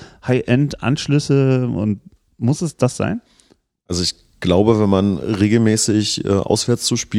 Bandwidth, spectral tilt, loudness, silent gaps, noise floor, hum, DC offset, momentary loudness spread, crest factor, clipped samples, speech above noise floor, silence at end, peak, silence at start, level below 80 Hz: 15 kHz; -5.5 dB/octave; -18 LUFS; none; -56 dBFS; none; under 0.1%; 8 LU; 18 dB; under 0.1%; 40 dB; 0 s; 0 dBFS; 0 s; -46 dBFS